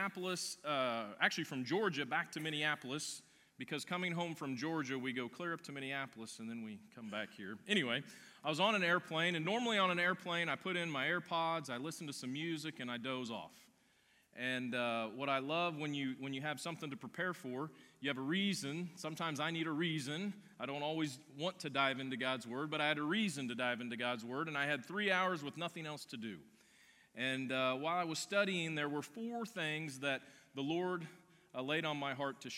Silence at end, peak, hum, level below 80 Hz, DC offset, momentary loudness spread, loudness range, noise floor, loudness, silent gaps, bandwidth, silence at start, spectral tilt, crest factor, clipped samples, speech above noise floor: 0 s; -16 dBFS; none; -90 dBFS; under 0.1%; 11 LU; 6 LU; -72 dBFS; -39 LUFS; none; 16.5 kHz; 0 s; -4 dB/octave; 24 dB; under 0.1%; 33 dB